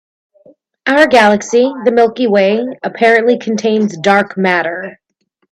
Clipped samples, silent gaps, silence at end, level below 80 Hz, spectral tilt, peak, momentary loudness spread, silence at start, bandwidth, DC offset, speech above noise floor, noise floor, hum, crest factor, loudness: under 0.1%; none; 0.6 s; -58 dBFS; -5 dB/octave; 0 dBFS; 11 LU; 0.85 s; 12 kHz; under 0.1%; 53 dB; -65 dBFS; none; 12 dB; -12 LUFS